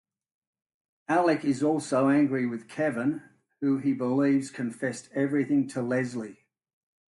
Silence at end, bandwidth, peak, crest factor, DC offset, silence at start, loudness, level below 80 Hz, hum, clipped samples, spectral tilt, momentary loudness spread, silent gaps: 0.8 s; 11.5 kHz; -12 dBFS; 16 dB; under 0.1%; 1.1 s; -27 LUFS; -74 dBFS; none; under 0.1%; -6.5 dB/octave; 10 LU; none